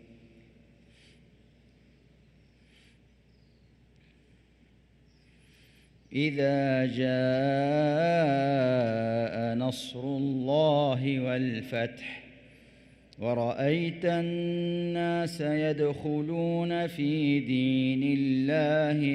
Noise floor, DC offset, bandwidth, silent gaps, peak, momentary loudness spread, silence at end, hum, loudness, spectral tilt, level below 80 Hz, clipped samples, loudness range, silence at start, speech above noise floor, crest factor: -61 dBFS; under 0.1%; 13.5 kHz; none; -14 dBFS; 7 LU; 0 s; none; -28 LUFS; -7.5 dB/octave; -66 dBFS; under 0.1%; 5 LU; 0.1 s; 34 dB; 16 dB